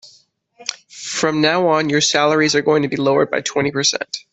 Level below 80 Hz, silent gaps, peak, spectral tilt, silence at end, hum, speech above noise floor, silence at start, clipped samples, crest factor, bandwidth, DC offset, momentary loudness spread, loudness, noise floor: -60 dBFS; none; -2 dBFS; -3.5 dB/octave; 0.15 s; none; 37 dB; 0.05 s; under 0.1%; 16 dB; 8.4 kHz; under 0.1%; 14 LU; -16 LUFS; -54 dBFS